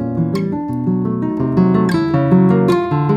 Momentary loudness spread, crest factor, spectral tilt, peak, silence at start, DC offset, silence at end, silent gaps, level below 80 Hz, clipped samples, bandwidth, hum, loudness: 7 LU; 14 dB; -9 dB/octave; -2 dBFS; 0 s; under 0.1%; 0 s; none; -46 dBFS; under 0.1%; 9.4 kHz; none; -15 LUFS